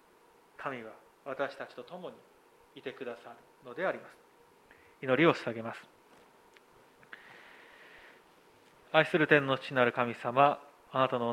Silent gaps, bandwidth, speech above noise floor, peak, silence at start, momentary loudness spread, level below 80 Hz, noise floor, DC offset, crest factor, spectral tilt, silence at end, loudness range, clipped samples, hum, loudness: none; 15.5 kHz; 32 dB; -8 dBFS; 0.6 s; 26 LU; -78 dBFS; -63 dBFS; under 0.1%; 26 dB; -6.5 dB/octave; 0 s; 13 LU; under 0.1%; none; -30 LUFS